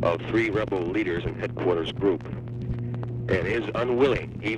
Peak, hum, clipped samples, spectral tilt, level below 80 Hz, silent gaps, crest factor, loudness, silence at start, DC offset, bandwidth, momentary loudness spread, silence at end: -8 dBFS; none; under 0.1%; -7.5 dB/octave; -46 dBFS; none; 18 dB; -26 LUFS; 0 s; under 0.1%; 9.2 kHz; 9 LU; 0 s